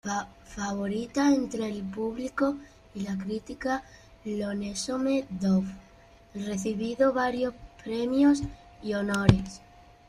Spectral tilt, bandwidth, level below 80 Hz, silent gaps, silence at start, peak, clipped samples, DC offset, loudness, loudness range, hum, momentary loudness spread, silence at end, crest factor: -6 dB/octave; 12.5 kHz; -48 dBFS; none; 0.05 s; -2 dBFS; under 0.1%; under 0.1%; -29 LUFS; 5 LU; none; 16 LU; 0.5 s; 26 dB